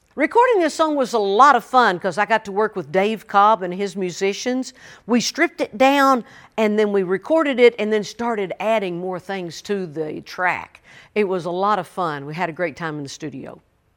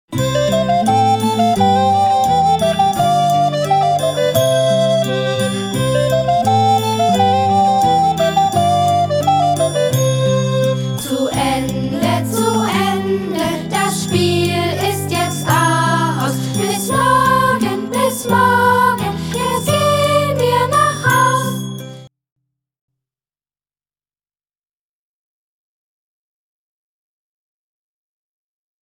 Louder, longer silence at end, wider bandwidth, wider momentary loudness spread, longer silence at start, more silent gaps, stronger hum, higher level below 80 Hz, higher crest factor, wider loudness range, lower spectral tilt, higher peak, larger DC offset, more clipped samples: second, -19 LUFS vs -15 LUFS; second, 0.45 s vs 6.75 s; second, 17.5 kHz vs 19.5 kHz; first, 13 LU vs 6 LU; about the same, 0.15 s vs 0.1 s; neither; second, none vs 50 Hz at -50 dBFS; second, -64 dBFS vs -46 dBFS; first, 20 dB vs 14 dB; first, 7 LU vs 3 LU; about the same, -4.5 dB/octave vs -5 dB/octave; about the same, 0 dBFS vs -2 dBFS; neither; neither